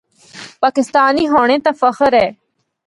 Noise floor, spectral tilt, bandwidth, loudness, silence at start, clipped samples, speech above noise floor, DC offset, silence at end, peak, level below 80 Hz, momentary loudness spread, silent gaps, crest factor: -37 dBFS; -4.5 dB/octave; 11.5 kHz; -14 LUFS; 0.35 s; under 0.1%; 24 dB; under 0.1%; 0.55 s; -2 dBFS; -52 dBFS; 8 LU; none; 14 dB